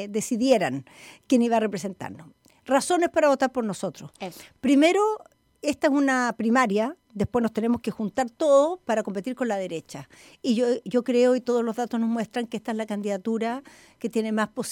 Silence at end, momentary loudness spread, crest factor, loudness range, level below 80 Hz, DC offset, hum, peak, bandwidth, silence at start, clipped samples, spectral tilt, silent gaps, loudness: 0 s; 14 LU; 18 dB; 2 LU; -62 dBFS; under 0.1%; none; -8 dBFS; 16 kHz; 0 s; under 0.1%; -5 dB/octave; none; -24 LUFS